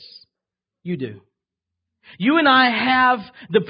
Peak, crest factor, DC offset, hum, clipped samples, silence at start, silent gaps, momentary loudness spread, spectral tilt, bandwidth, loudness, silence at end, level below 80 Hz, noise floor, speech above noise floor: -4 dBFS; 18 dB; under 0.1%; none; under 0.1%; 0.85 s; none; 16 LU; -9.5 dB/octave; 5.4 kHz; -17 LUFS; 0 s; -64 dBFS; -86 dBFS; 68 dB